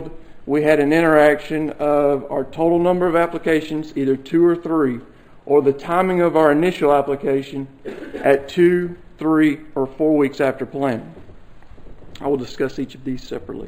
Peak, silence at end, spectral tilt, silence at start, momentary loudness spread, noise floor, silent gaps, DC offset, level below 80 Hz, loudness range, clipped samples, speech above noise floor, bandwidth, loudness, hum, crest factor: 0 dBFS; 0 s; -7 dB/octave; 0 s; 14 LU; -38 dBFS; none; under 0.1%; -48 dBFS; 5 LU; under 0.1%; 21 dB; 15 kHz; -18 LUFS; none; 18 dB